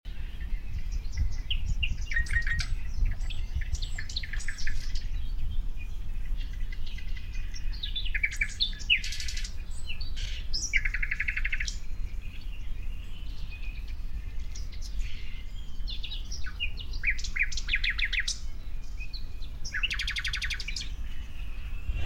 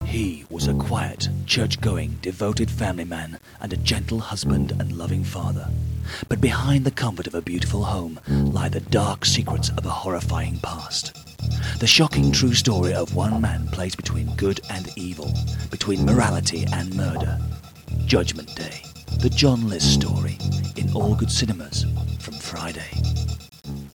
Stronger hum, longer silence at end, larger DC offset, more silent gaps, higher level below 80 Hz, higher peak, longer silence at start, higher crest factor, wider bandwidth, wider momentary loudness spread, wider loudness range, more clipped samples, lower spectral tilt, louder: neither; about the same, 0 s vs 0.1 s; neither; neither; about the same, -32 dBFS vs -34 dBFS; second, -10 dBFS vs -2 dBFS; about the same, 0.05 s vs 0 s; about the same, 18 dB vs 20 dB; second, 10 kHz vs 17.5 kHz; about the same, 14 LU vs 12 LU; first, 9 LU vs 5 LU; neither; second, -2 dB/octave vs -5 dB/octave; second, -34 LUFS vs -23 LUFS